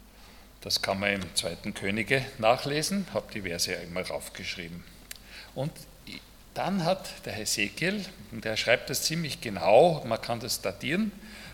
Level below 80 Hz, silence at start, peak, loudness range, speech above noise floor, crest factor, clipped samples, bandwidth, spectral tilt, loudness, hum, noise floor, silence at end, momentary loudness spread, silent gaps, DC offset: -56 dBFS; 0 s; -6 dBFS; 8 LU; 22 dB; 24 dB; under 0.1%; 18 kHz; -3.5 dB/octave; -28 LUFS; none; -51 dBFS; 0 s; 18 LU; none; under 0.1%